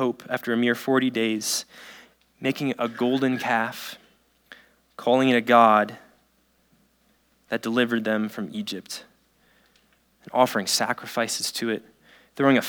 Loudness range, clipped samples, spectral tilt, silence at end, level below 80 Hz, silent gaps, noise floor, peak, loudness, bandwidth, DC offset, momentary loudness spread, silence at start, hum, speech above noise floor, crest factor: 7 LU; under 0.1%; -3.5 dB/octave; 0 s; -74 dBFS; none; -65 dBFS; -2 dBFS; -24 LUFS; over 20 kHz; under 0.1%; 14 LU; 0 s; none; 42 dB; 22 dB